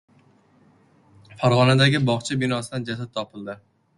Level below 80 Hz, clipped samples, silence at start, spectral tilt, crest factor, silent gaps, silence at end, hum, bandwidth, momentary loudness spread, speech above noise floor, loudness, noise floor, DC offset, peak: -56 dBFS; under 0.1%; 1.3 s; -5.5 dB/octave; 20 dB; none; 0.4 s; none; 11.5 kHz; 19 LU; 36 dB; -21 LUFS; -57 dBFS; under 0.1%; -2 dBFS